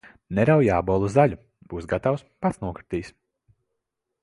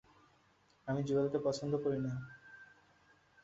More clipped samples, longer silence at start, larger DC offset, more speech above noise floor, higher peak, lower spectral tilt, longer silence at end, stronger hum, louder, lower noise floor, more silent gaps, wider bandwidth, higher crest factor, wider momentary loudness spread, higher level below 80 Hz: neither; second, 0.3 s vs 0.85 s; neither; first, 59 dB vs 35 dB; first, -4 dBFS vs -22 dBFS; about the same, -8 dB/octave vs -7 dB/octave; first, 1.15 s vs 0.8 s; neither; first, -23 LUFS vs -37 LUFS; first, -81 dBFS vs -70 dBFS; neither; first, 11.5 kHz vs 7.6 kHz; about the same, 20 dB vs 16 dB; second, 17 LU vs 21 LU; first, -46 dBFS vs -70 dBFS